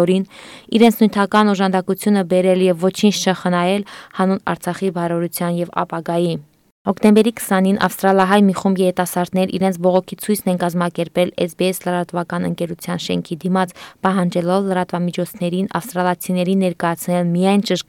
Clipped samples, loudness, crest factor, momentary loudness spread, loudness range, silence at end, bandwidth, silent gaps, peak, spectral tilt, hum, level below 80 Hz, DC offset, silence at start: under 0.1%; -18 LUFS; 14 dB; 9 LU; 5 LU; 0.05 s; 17 kHz; 6.71-6.85 s; -2 dBFS; -6 dB/octave; none; -60 dBFS; under 0.1%; 0 s